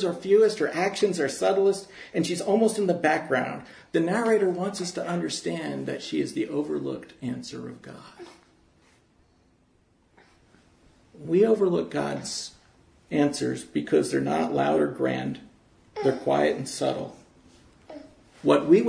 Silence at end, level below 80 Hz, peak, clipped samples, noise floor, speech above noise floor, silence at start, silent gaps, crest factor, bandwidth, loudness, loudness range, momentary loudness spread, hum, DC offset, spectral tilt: 0 s; -66 dBFS; -6 dBFS; under 0.1%; -64 dBFS; 39 dB; 0 s; none; 20 dB; 11 kHz; -26 LUFS; 9 LU; 18 LU; none; under 0.1%; -5 dB/octave